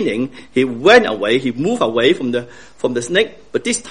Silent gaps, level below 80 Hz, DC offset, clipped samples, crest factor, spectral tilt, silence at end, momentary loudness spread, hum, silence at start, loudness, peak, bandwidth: none; -52 dBFS; 0.7%; under 0.1%; 16 dB; -4 dB/octave; 0 s; 12 LU; none; 0 s; -16 LUFS; 0 dBFS; 10.5 kHz